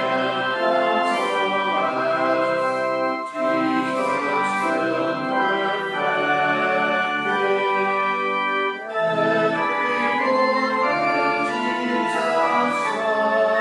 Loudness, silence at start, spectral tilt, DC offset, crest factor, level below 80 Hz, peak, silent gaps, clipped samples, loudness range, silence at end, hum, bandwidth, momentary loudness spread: -21 LUFS; 0 s; -4.5 dB/octave; under 0.1%; 14 dB; -72 dBFS; -8 dBFS; none; under 0.1%; 1 LU; 0 s; none; 12 kHz; 3 LU